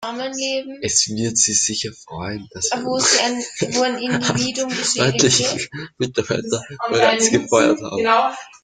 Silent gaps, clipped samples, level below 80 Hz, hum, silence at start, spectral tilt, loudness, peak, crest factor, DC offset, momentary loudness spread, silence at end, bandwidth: none; under 0.1%; -56 dBFS; none; 0 s; -2.5 dB/octave; -18 LUFS; -2 dBFS; 18 dB; under 0.1%; 11 LU; 0.15 s; 10.5 kHz